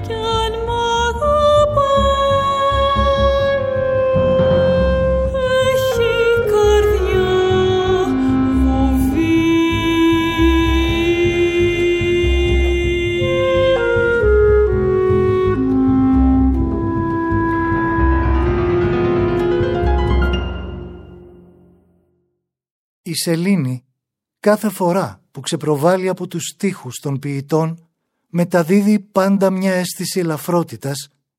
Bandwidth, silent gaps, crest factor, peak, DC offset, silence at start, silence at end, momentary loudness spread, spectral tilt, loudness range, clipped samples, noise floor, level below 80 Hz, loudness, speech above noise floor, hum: 16.5 kHz; 22.71-23.04 s; 14 dB; -2 dBFS; under 0.1%; 0 s; 0.35 s; 8 LU; -6 dB/octave; 6 LU; under 0.1%; -79 dBFS; -26 dBFS; -16 LUFS; 62 dB; none